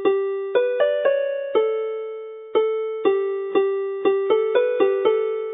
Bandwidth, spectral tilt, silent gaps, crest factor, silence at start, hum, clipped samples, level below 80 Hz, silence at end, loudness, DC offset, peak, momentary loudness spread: 3.9 kHz; -8.5 dB/octave; none; 16 dB; 0 s; none; under 0.1%; -76 dBFS; 0 s; -21 LUFS; under 0.1%; -6 dBFS; 6 LU